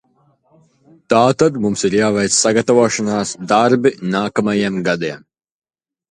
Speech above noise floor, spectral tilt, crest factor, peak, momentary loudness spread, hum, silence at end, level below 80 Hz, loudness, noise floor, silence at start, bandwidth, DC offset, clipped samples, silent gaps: 43 dB; -4 dB/octave; 16 dB; 0 dBFS; 7 LU; none; 0.95 s; -54 dBFS; -15 LUFS; -58 dBFS; 1.1 s; 11 kHz; under 0.1%; under 0.1%; none